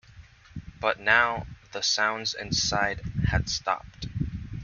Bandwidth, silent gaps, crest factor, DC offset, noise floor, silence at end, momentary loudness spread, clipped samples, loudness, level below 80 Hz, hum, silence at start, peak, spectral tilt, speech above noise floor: 7.4 kHz; none; 24 dB; under 0.1%; -51 dBFS; 0 s; 16 LU; under 0.1%; -26 LUFS; -42 dBFS; none; 0.15 s; -4 dBFS; -3 dB/octave; 24 dB